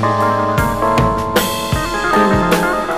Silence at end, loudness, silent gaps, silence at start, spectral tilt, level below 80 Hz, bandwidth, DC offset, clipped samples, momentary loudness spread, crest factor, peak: 0 s; -15 LUFS; none; 0 s; -5 dB/octave; -30 dBFS; 15.5 kHz; 0.8%; under 0.1%; 4 LU; 10 dB; -4 dBFS